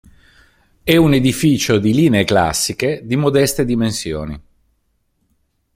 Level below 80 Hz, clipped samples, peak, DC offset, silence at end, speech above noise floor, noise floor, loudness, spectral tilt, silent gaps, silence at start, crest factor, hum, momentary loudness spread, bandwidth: -40 dBFS; under 0.1%; 0 dBFS; under 0.1%; 1.35 s; 50 dB; -65 dBFS; -15 LUFS; -5 dB/octave; none; 0.85 s; 16 dB; none; 12 LU; 16.5 kHz